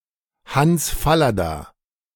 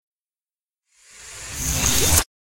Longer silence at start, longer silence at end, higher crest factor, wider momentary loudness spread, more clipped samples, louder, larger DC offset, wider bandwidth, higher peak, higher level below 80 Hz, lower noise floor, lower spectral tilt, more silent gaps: second, 0.5 s vs 1.1 s; first, 0.45 s vs 0.3 s; second, 16 dB vs 24 dB; second, 9 LU vs 19 LU; neither; about the same, -19 LUFS vs -19 LUFS; neither; about the same, 17.5 kHz vs 16.5 kHz; second, -4 dBFS vs 0 dBFS; about the same, -36 dBFS vs -34 dBFS; second, -51 dBFS vs under -90 dBFS; first, -5 dB/octave vs -2 dB/octave; neither